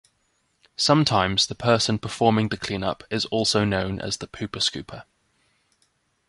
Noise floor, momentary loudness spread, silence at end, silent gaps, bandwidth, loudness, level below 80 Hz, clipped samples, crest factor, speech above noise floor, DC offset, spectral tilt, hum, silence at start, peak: -69 dBFS; 12 LU; 1.25 s; none; 11.5 kHz; -23 LUFS; -50 dBFS; under 0.1%; 22 dB; 46 dB; under 0.1%; -4.5 dB/octave; none; 0.8 s; -4 dBFS